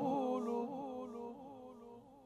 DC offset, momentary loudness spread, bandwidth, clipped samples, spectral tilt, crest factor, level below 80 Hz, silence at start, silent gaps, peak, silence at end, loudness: under 0.1%; 18 LU; 12.5 kHz; under 0.1%; -7.5 dB/octave; 16 dB; -78 dBFS; 0 s; none; -26 dBFS; 0 s; -42 LUFS